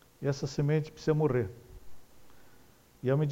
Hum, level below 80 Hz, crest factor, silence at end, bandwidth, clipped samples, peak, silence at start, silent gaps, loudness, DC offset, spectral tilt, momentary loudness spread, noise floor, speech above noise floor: none; -56 dBFS; 16 dB; 0 s; 15 kHz; under 0.1%; -16 dBFS; 0.2 s; none; -31 LUFS; under 0.1%; -7.5 dB/octave; 9 LU; -59 dBFS; 30 dB